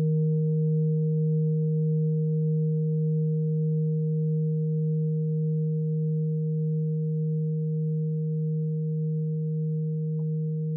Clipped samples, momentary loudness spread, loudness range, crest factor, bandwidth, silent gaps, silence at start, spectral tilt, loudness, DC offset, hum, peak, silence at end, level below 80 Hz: under 0.1%; 4 LU; 3 LU; 8 dB; 0.5 kHz; none; 0 s; -19.5 dB/octave; -27 LUFS; under 0.1%; none; -18 dBFS; 0 s; -74 dBFS